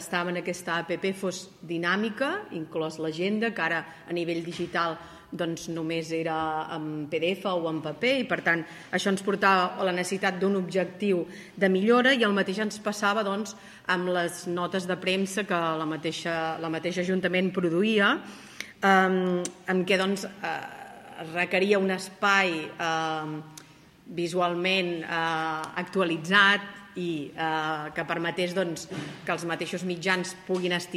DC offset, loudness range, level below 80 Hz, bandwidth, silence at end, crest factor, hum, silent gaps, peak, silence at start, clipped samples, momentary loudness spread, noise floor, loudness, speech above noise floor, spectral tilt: under 0.1%; 5 LU; -70 dBFS; 15.5 kHz; 0 s; 22 dB; none; none; -6 dBFS; 0 s; under 0.1%; 11 LU; -52 dBFS; -27 LUFS; 25 dB; -4.5 dB/octave